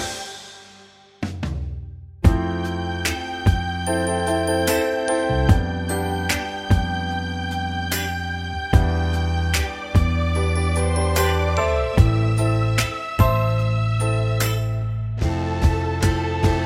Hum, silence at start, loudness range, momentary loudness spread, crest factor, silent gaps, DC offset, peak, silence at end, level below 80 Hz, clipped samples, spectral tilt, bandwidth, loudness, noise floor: none; 0 s; 4 LU; 9 LU; 18 dB; none; under 0.1%; -2 dBFS; 0 s; -28 dBFS; under 0.1%; -5.5 dB/octave; 16 kHz; -22 LUFS; -48 dBFS